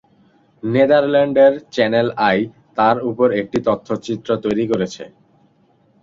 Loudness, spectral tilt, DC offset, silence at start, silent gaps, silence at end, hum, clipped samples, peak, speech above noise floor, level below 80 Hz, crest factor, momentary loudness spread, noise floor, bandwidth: -17 LUFS; -6.5 dB/octave; under 0.1%; 0.65 s; none; 0.95 s; none; under 0.1%; -2 dBFS; 40 dB; -56 dBFS; 16 dB; 10 LU; -57 dBFS; 7.6 kHz